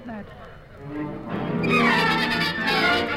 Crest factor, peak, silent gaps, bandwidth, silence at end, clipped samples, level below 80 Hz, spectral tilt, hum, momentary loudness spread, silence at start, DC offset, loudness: 16 dB; -8 dBFS; none; 16 kHz; 0 s; under 0.1%; -48 dBFS; -5 dB/octave; none; 19 LU; 0 s; under 0.1%; -21 LUFS